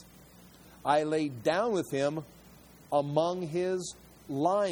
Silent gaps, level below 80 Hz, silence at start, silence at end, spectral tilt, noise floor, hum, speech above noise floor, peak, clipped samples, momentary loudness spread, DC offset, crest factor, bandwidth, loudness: none; -66 dBFS; 0 s; 0 s; -5.5 dB/octave; -55 dBFS; none; 25 dB; -12 dBFS; under 0.1%; 12 LU; under 0.1%; 18 dB; over 20 kHz; -31 LUFS